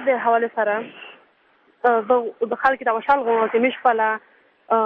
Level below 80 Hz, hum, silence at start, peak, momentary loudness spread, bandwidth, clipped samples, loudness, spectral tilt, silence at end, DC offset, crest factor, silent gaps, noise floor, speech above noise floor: -64 dBFS; none; 0 s; -4 dBFS; 8 LU; 5 kHz; under 0.1%; -20 LUFS; -6.5 dB/octave; 0 s; under 0.1%; 16 dB; none; -59 dBFS; 39 dB